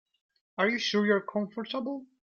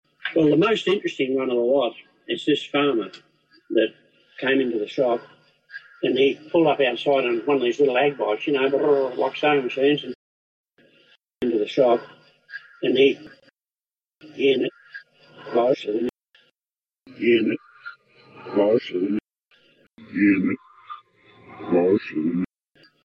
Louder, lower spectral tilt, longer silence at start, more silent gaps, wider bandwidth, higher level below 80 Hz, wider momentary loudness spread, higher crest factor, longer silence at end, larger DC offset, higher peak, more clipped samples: second, -29 LUFS vs -22 LUFS; second, -5 dB/octave vs -6.5 dB/octave; first, 0.6 s vs 0.25 s; second, none vs 10.15-10.64 s; second, 7 kHz vs 8 kHz; second, -76 dBFS vs -68 dBFS; second, 10 LU vs 21 LU; about the same, 18 dB vs 16 dB; second, 0.2 s vs 0.6 s; neither; second, -12 dBFS vs -6 dBFS; neither